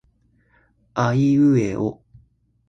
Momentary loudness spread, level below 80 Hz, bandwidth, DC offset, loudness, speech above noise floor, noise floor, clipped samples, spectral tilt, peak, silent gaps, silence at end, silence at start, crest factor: 11 LU; -54 dBFS; 7.6 kHz; under 0.1%; -20 LUFS; 43 dB; -61 dBFS; under 0.1%; -8 dB/octave; -6 dBFS; none; 0.75 s; 0.95 s; 16 dB